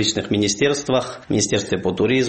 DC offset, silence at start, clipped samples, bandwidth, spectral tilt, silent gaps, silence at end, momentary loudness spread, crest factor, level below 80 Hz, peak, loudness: under 0.1%; 0 s; under 0.1%; 8.8 kHz; -4 dB/octave; none; 0 s; 4 LU; 16 dB; -50 dBFS; -4 dBFS; -20 LUFS